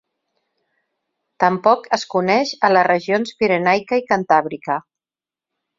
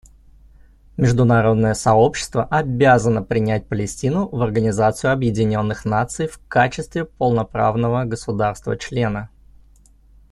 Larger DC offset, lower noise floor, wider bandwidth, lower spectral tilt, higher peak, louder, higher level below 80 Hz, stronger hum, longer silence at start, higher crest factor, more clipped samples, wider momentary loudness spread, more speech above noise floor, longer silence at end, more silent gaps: neither; first, under -90 dBFS vs -50 dBFS; second, 7.8 kHz vs 12 kHz; second, -5 dB/octave vs -6.5 dB/octave; about the same, -2 dBFS vs -2 dBFS; about the same, -18 LUFS vs -19 LUFS; second, -62 dBFS vs -42 dBFS; neither; first, 1.4 s vs 0.95 s; about the same, 18 dB vs 16 dB; neither; about the same, 7 LU vs 9 LU; first, over 73 dB vs 32 dB; about the same, 1 s vs 1.05 s; neither